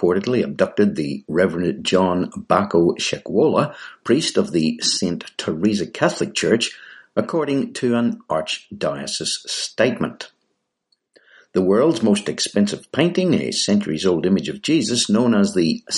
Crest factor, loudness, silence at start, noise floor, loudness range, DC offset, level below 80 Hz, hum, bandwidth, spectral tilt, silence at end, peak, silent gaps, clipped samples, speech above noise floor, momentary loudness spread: 18 dB; -20 LUFS; 0 s; -73 dBFS; 4 LU; under 0.1%; -58 dBFS; none; 11.5 kHz; -4.5 dB/octave; 0 s; -2 dBFS; none; under 0.1%; 54 dB; 8 LU